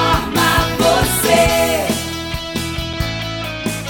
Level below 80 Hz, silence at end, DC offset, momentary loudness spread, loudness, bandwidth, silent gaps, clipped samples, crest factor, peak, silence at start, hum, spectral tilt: -30 dBFS; 0 s; under 0.1%; 10 LU; -16 LUFS; 19 kHz; none; under 0.1%; 16 dB; 0 dBFS; 0 s; none; -3.5 dB/octave